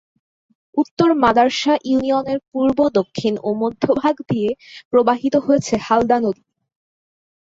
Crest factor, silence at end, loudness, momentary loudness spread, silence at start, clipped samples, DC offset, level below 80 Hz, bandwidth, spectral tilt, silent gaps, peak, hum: 16 dB; 1.15 s; -18 LUFS; 8 LU; 0.75 s; under 0.1%; under 0.1%; -52 dBFS; 7.8 kHz; -5.5 dB/octave; 0.91-0.97 s, 2.48-2.52 s, 4.85-4.91 s; -2 dBFS; none